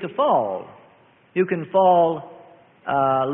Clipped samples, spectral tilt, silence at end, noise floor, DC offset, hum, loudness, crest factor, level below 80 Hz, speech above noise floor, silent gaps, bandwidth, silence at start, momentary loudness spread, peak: under 0.1%; -11 dB/octave; 0 s; -54 dBFS; under 0.1%; none; -20 LUFS; 16 dB; -64 dBFS; 34 dB; none; 3.8 kHz; 0 s; 15 LU; -6 dBFS